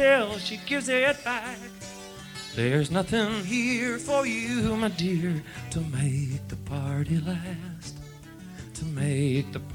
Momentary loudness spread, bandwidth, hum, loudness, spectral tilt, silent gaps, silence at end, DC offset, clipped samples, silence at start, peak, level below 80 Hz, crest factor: 16 LU; 18 kHz; none; -27 LUFS; -5.5 dB/octave; none; 0 s; under 0.1%; under 0.1%; 0 s; -8 dBFS; -52 dBFS; 20 dB